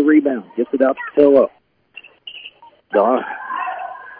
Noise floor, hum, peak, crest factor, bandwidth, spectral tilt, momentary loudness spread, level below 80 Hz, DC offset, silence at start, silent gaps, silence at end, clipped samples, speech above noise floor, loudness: -43 dBFS; none; -2 dBFS; 16 dB; 4.1 kHz; -9 dB/octave; 22 LU; -66 dBFS; under 0.1%; 0 s; none; 0.05 s; under 0.1%; 28 dB; -17 LUFS